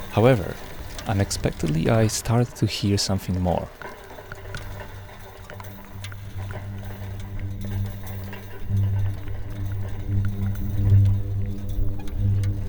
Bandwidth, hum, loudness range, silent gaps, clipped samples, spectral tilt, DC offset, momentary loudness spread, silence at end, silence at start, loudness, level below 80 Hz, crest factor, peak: over 20 kHz; none; 12 LU; none; under 0.1%; -6 dB/octave; under 0.1%; 18 LU; 0 s; 0 s; -25 LUFS; -34 dBFS; 20 dB; -4 dBFS